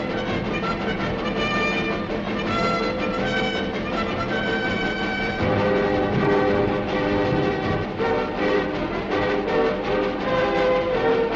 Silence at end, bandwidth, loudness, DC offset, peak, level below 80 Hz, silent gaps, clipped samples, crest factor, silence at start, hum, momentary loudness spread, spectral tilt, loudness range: 0 s; 8 kHz; -23 LUFS; under 0.1%; -10 dBFS; -40 dBFS; none; under 0.1%; 12 dB; 0 s; none; 5 LU; -6.5 dB/octave; 2 LU